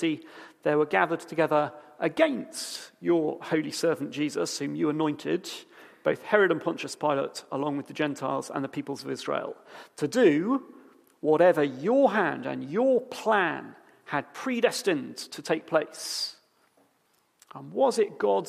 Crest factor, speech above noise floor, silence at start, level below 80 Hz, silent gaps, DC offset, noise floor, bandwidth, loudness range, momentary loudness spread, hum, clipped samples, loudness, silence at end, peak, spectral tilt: 22 dB; 42 dB; 0 s; -80 dBFS; none; under 0.1%; -69 dBFS; 15 kHz; 5 LU; 12 LU; none; under 0.1%; -27 LUFS; 0 s; -6 dBFS; -4.5 dB/octave